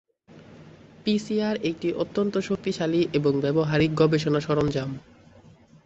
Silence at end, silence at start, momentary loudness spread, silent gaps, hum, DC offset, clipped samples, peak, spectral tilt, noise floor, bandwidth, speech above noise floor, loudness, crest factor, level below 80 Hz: 0.85 s; 0.35 s; 7 LU; none; none; under 0.1%; under 0.1%; -8 dBFS; -7 dB/octave; -52 dBFS; 8.2 kHz; 28 dB; -25 LUFS; 18 dB; -54 dBFS